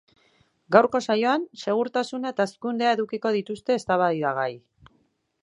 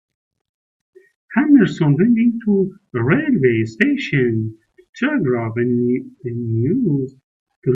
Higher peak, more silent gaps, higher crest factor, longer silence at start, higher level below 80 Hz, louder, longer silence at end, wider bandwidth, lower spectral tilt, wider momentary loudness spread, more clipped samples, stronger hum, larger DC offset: about the same, -2 dBFS vs 0 dBFS; second, none vs 4.89-4.93 s, 7.24-7.46 s, 7.56-7.62 s; first, 24 dB vs 18 dB; second, 0.7 s vs 1.3 s; second, -70 dBFS vs -58 dBFS; second, -24 LUFS vs -18 LUFS; first, 0.85 s vs 0 s; first, 11 kHz vs 7.6 kHz; second, -5.5 dB/octave vs -8.5 dB/octave; about the same, 8 LU vs 10 LU; neither; neither; neither